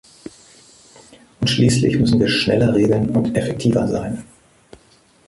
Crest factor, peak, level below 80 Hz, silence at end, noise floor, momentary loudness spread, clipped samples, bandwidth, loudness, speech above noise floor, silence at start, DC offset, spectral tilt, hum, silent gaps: 16 dB; -4 dBFS; -44 dBFS; 1.05 s; -53 dBFS; 15 LU; under 0.1%; 11.5 kHz; -17 LUFS; 37 dB; 1.4 s; under 0.1%; -6 dB/octave; none; none